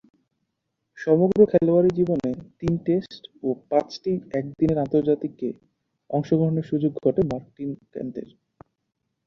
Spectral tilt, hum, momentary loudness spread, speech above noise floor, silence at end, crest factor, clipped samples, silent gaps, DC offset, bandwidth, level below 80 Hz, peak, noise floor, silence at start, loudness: -9 dB/octave; none; 15 LU; 56 dB; 1 s; 20 dB; under 0.1%; none; under 0.1%; 7.2 kHz; -56 dBFS; -4 dBFS; -79 dBFS; 0.95 s; -23 LUFS